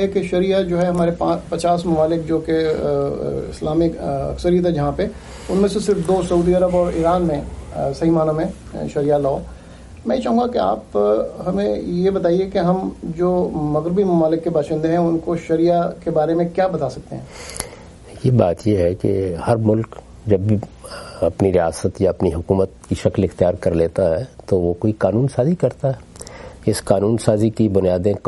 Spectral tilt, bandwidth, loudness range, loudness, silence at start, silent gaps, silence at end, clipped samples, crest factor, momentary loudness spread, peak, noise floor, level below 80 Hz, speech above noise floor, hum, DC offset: -7.5 dB/octave; 11.5 kHz; 2 LU; -19 LUFS; 0 s; none; 0 s; under 0.1%; 18 dB; 9 LU; 0 dBFS; -38 dBFS; -40 dBFS; 20 dB; none; under 0.1%